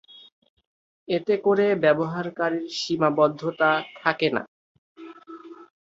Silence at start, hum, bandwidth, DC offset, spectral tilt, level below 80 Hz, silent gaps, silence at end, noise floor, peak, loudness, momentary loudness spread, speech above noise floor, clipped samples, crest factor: 1.1 s; none; 7.8 kHz; under 0.1%; -5.5 dB/octave; -70 dBFS; 4.48-4.95 s; 0.2 s; -43 dBFS; -4 dBFS; -23 LUFS; 22 LU; 21 dB; under 0.1%; 22 dB